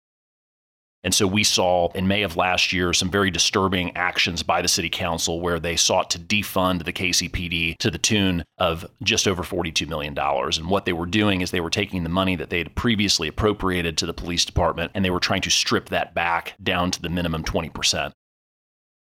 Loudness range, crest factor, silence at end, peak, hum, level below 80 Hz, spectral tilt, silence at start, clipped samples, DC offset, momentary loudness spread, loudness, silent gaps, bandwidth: 3 LU; 16 dB; 1.05 s; -6 dBFS; none; -42 dBFS; -3 dB/octave; 1.05 s; under 0.1%; under 0.1%; 6 LU; -22 LUFS; none; 17 kHz